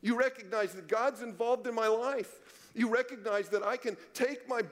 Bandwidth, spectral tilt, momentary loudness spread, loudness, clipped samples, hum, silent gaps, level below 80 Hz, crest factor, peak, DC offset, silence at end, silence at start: 16 kHz; -4 dB/octave; 6 LU; -33 LUFS; under 0.1%; none; none; -82 dBFS; 16 dB; -18 dBFS; under 0.1%; 0 s; 0.05 s